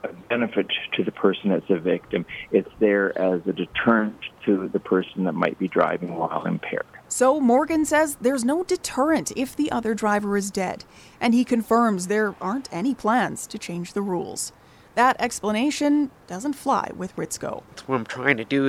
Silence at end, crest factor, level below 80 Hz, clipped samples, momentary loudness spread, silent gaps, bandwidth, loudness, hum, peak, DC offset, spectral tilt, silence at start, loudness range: 0 s; 20 dB; -58 dBFS; under 0.1%; 10 LU; none; 15.5 kHz; -23 LUFS; none; -2 dBFS; under 0.1%; -4.5 dB/octave; 0.05 s; 3 LU